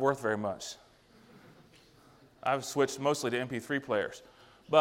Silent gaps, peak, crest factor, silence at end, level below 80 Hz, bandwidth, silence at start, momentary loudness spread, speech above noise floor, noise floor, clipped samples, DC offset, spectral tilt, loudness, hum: none; -10 dBFS; 24 dB; 0 s; -70 dBFS; 16 kHz; 0 s; 12 LU; 28 dB; -60 dBFS; under 0.1%; under 0.1%; -4.5 dB/octave; -32 LUFS; none